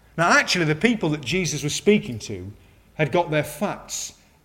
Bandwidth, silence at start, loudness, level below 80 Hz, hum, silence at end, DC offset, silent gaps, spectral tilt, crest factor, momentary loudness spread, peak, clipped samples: 16.5 kHz; 0.15 s; -22 LUFS; -52 dBFS; none; 0.3 s; under 0.1%; none; -4 dB/octave; 22 dB; 16 LU; -2 dBFS; under 0.1%